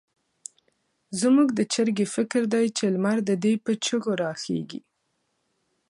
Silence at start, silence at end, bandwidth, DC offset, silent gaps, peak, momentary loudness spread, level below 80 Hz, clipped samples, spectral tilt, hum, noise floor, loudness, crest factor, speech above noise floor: 1.1 s; 1.1 s; 11.5 kHz; under 0.1%; none; -10 dBFS; 20 LU; -74 dBFS; under 0.1%; -5 dB/octave; none; -74 dBFS; -24 LUFS; 16 dB; 51 dB